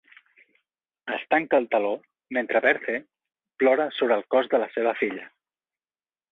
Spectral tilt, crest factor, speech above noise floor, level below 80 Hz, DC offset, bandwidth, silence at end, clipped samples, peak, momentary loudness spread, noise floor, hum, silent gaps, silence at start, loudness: -6.5 dB/octave; 20 dB; over 66 dB; -74 dBFS; under 0.1%; 4.1 kHz; 1.05 s; under 0.1%; -6 dBFS; 11 LU; under -90 dBFS; none; none; 1.05 s; -24 LUFS